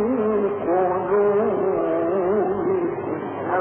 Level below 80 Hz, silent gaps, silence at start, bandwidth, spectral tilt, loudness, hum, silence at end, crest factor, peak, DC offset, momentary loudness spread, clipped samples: -54 dBFS; none; 0 s; 3.4 kHz; -11.5 dB/octave; -22 LUFS; none; 0 s; 12 dB; -10 dBFS; under 0.1%; 6 LU; under 0.1%